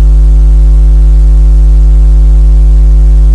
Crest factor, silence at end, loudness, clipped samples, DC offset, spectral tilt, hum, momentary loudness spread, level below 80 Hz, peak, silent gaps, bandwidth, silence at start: 2 dB; 0 s; -7 LUFS; 0.2%; 0.2%; -9 dB/octave; none; 0 LU; -2 dBFS; 0 dBFS; none; 1.4 kHz; 0 s